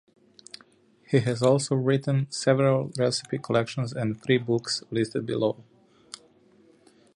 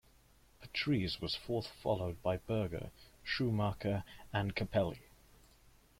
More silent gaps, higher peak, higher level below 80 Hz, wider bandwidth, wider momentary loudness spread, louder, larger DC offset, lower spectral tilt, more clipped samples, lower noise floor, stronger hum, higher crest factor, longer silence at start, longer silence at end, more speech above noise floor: neither; first, -8 dBFS vs -20 dBFS; second, -66 dBFS vs -58 dBFS; second, 11.5 kHz vs 16.5 kHz; first, 22 LU vs 7 LU; first, -26 LUFS vs -37 LUFS; neither; about the same, -5.5 dB/octave vs -6.5 dB/octave; neither; second, -59 dBFS vs -66 dBFS; neither; about the same, 20 dB vs 18 dB; first, 1.1 s vs 0.6 s; first, 1.55 s vs 1 s; first, 34 dB vs 29 dB